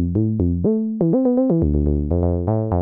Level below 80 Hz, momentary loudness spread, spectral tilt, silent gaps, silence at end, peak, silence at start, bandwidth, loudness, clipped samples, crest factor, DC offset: -30 dBFS; 3 LU; -15 dB/octave; none; 0 s; -6 dBFS; 0 s; 2 kHz; -19 LUFS; under 0.1%; 12 dB; under 0.1%